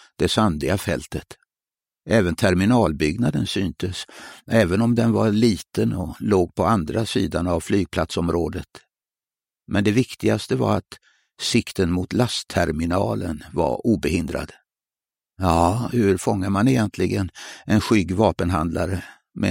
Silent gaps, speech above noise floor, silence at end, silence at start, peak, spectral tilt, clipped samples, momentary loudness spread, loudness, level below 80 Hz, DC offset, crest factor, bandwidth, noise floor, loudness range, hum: none; over 69 dB; 0 s; 0.2 s; -2 dBFS; -6 dB/octave; under 0.1%; 9 LU; -21 LUFS; -42 dBFS; under 0.1%; 20 dB; 16.5 kHz; under -90 dBFS; 3 LU; none